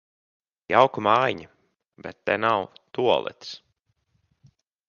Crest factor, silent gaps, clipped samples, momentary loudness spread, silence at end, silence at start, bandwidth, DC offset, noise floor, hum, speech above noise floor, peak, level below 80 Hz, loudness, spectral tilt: 24 dB; 1.87-1.92 s; under 0.1%; 20 LU; 1.3 s; 0.7 s; 7 kHz; under 0.1%; -72 dBFS; none; 49 dB; -2 dBFS; -64 dBFS; -23 LUFS; -5.5 dB/octave